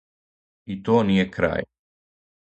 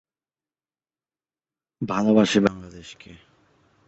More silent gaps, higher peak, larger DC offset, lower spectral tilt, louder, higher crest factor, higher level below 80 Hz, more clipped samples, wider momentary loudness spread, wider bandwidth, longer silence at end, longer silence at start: neither; about the same, -6 dBFS vs -4 dBFS; neither; first, -7.5 dB/octave vs -5.5 dB/octave; about the same, -22 LUFS vs -21 LUFS; about the same, 20 dB vs 22 dB; first, -50 dBFS vs -58 dBFS; neither; second, 16 LU vs 24 LU; about the same, 8.2 kHz vs 8.2 kHz; first, 0.9 s vs 0.75 s; second, 0.7 s vs 1.8 s